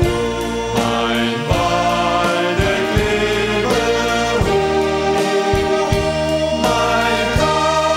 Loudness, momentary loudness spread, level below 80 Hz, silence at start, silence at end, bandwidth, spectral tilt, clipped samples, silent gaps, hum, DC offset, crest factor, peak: -16 LUFS; 3 LU; -30 dBFS; 0 s; 0 s; 16 kHz; -4.5 dB/octave; under 0.1%; none; none; under 0.1%; 14 dB; -2 dBFS